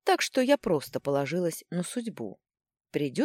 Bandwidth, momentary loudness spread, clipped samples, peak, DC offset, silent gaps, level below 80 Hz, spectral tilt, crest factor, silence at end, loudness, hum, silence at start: 16.5 kHz; 12 LU; under 0.1%; -10 dBFS; under 0.1%; none; -68 dBFS; -4.5 dB/octave; 18 dB; 0 s; -29 LUFS; none; 0.05 s